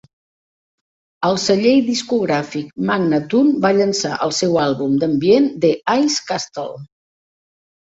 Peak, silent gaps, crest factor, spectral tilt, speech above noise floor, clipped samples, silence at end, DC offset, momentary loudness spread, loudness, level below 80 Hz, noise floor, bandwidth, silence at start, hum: -2 dBFS; none; 16 dB; -4.5 dB/octave; over 74 dB; under 0.1%; 1 s; under 0.1%; 9 LU; -17 LUFS; -58 dBFS; under -90 dBFS; 8 kHz; 1.2 s; none